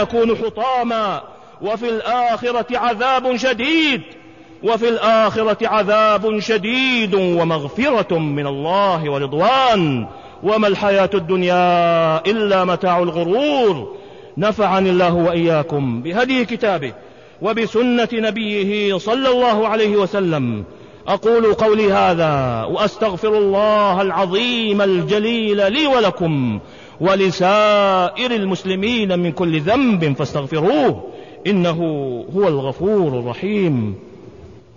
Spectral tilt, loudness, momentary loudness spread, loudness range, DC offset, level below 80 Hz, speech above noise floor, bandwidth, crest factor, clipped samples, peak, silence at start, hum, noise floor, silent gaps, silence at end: -6 dB/octave; -17 LUFS; 7 LU; 3 LU; 0.2%; -50 dBFS; 24 dB; 7.4 kHz; 12 dB; under 0.1%; -4 dBFS; 0 s; none; -40 dBFS; none; 0.15 s